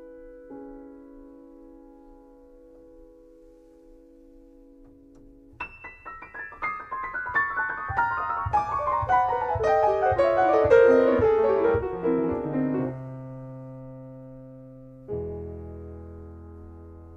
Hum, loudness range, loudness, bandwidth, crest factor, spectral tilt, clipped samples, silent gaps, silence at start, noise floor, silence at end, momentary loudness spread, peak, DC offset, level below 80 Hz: none; 19 LU; -24 LUFS; 7 kHz; 20 dB; -8 dB/octave; under 0.1%; none; 0 s; -52 dBFS; 0 s; 24 LU; -8 dBFS; under 0.1%; -48 dBFS